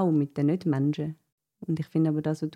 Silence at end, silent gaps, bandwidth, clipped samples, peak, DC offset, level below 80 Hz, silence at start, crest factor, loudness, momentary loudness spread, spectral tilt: 0.05 s; 1.32-1.38 s; 9.8 kHz; under 0.1%; -14 dBFS; under 0.1%; -70 dBFS; 0 s; 12 dB; -28 LUFS; 8 LU; -9 dB/octave